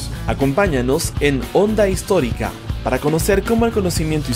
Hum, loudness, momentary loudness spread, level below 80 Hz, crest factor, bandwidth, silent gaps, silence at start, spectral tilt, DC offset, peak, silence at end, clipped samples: none; -18 LUFS; 6 LU; -28 dBFS; 14 dB; 16 kHz; none; 0 s; -5.5 dB/octave; under 0.1%; -4 dBFS; 0 s; under 0.1%